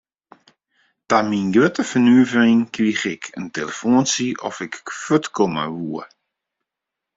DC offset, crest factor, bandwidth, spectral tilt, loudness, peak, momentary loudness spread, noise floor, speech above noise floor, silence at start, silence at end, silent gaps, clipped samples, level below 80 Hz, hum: under 0.1%; 18 dB; 7.8 kHz; -4.5 dB/octave; -19 LUFS; -2 dBFS; 15 LU; -84 dBFS; 66 dB; 1.1 s; 1.1 s; none; under 0.1%; -62 dBFS; none